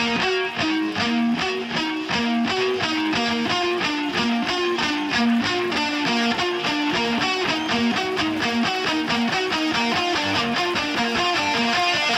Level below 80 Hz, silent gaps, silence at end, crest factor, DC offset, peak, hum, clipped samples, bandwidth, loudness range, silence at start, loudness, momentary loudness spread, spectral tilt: -54 dBFS; none; 0 s; 14 dB; under 0.1%; -8 dBFS; none; under 0.1%; 15 kHz; 1 LU; 0 s; -21 LUFS; 2 LU; -3.5 dB/octave